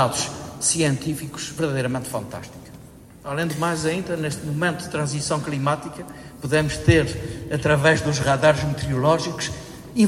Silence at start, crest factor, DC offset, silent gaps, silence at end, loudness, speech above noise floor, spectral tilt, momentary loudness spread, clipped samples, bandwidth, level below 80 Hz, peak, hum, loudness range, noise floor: 0 s; 22 dB; under 0.1%; none; 0 s; -22 LUFS; 22 dB; -4.5 dB/octave; 16 LU; under 0.1%; 16 kHz; -44 dBFS; -2 dBFS; none; 6 LU; -44 dBFS